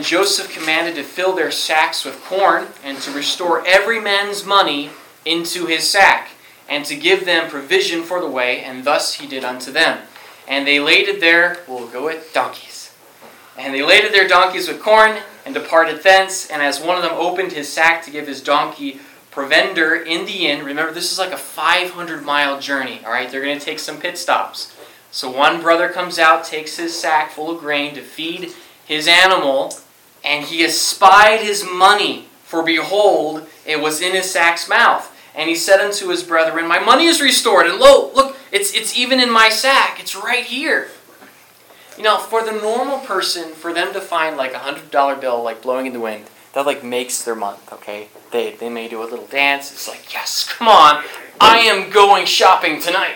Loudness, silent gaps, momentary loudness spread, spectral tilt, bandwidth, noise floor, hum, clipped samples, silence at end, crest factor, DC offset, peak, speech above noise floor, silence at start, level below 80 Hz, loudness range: -15 LUFS; none; 15 LU; -1 dB/octave; 18.5 kHz; -46 dBFS; none; 0.2%; 0 s; 16 dB; under 0.1%; 0 dBFS; 30 dB; 0 s; -56 dBFS; 8 LU